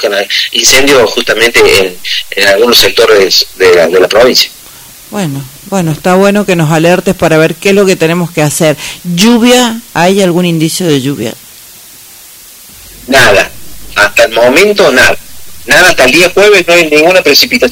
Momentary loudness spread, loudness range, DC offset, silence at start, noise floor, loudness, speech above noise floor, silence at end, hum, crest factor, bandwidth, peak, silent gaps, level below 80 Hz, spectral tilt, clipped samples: 11 LU; 6 LU; under 0.1%; 0 s; -32 dBFS; -6 LUFS; 26 dB; 0 s; none; 8 dB; over 20 kHz; 0 dBFS; none; -36 dBFS; -3.5 dB/octave; 4%